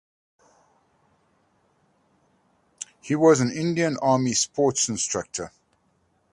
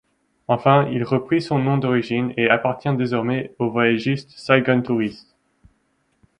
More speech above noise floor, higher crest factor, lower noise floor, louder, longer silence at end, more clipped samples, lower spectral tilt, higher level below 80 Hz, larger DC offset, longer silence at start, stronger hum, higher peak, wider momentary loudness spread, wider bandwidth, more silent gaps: about the same, 45 dB vs 47 dB; about the same, 22 dB vs 20 dB; about the same, -67 dBFS vs -67 dBFS; about the same, -22 LUFS vs -20 LUFS; second, 0.85 s vs 1.2 s; neither; second, -4 dB/octave vs -7.5 dB/octave; about the same, -64 dBFS vs -60 dBFS; neither; first, 2.8 s vs 0.5 s; neither; about the same, -4 dBFS vs -2 dBFS; first, 20 LU vs 7 LU; first, 11.5 kHz vs 10 kHz; neither